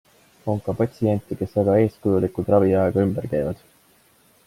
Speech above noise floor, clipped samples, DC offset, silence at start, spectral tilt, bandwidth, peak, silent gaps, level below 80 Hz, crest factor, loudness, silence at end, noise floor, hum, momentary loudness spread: 37 dB; under 0.1%; under 0.1%; 0.45 s; -9.5 dB/octave; 15.5 kHz; -4 dBFS; none; -52 dBFS; 18 dB; -22 LUFS; 0.9 s; -58 dBFS; none; 9 LU